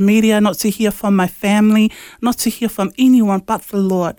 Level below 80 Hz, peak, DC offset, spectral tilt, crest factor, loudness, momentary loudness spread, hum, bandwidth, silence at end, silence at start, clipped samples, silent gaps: -48 dBFS; -2 dBFS; under 0.1%; -5.5 dB/octave; 12 dB; -15 LUFS; 8 LU; none; over 20 kHz; 0.05 s; 0 s; under 0.1%; none